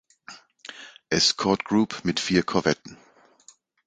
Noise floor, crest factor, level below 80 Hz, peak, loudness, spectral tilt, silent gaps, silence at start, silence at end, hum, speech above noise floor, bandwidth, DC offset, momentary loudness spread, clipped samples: -56 dBFS; 22 dB; -56 dBFS; -4 dBFS; -23 LUFS; -3.5 dB/octave; none; 0.3 s; 0.95 s; none; 33 dB; 9.4 kHz; under 0.1%; 24 LU; under 0.1%